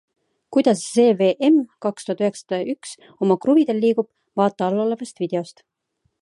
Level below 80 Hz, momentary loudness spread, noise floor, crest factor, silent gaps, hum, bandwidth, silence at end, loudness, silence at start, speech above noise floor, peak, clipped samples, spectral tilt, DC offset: -72 dBFS; 11 LU; -71 dBFS; 18 dB; none; none; 11.5 kHz; 0.7 s; -20 LUFS; 0.5 s; 51 dB; -4 dBFS; under 0.1%; -6 dB/octave; under 0.1%